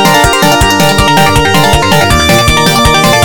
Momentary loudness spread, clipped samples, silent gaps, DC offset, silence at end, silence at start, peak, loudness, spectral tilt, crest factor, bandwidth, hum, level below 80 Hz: 1 LU; 3%; none; under 0.1%; 0 s; 0 s; 0 dBFS; -6 LUFS; -3.5 dB/octave; 6 dB; over 20 kHz; none; -18 dBFS